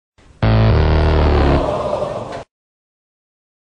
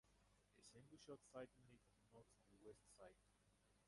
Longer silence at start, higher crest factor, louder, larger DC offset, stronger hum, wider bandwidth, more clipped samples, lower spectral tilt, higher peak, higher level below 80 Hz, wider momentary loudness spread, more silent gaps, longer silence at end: first, 0.4 s vs 0.05 s; second, 16 dB vs 24 dB; first, -16 LUFS vs -64 LUFS; neither; second, none vs 50 Hz at -85 dBFS; second, 7.4 kHz vs 11.5 kHz; neither; first, -8 dB/octave vs -4.5 dB/octave; first, -2 dBFS vs -44 dBFS; first, -22 dBFS vs -84 dBFS; first, 13 LU vs 8 LU; neither; first, 1.2 s vs 0 s